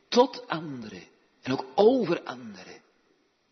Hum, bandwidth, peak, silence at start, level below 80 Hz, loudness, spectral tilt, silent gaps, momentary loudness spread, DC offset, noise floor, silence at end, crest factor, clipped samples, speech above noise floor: none; 6.4 kHz; -6 dBFS; 0.1 s; -74 dBFS; -26 LUFS; -5.5 dB/octave; none; 23 LU; under 0.1%; -68 dBFS; 0.75 s; 22 dB; under 0.1%; 42 dB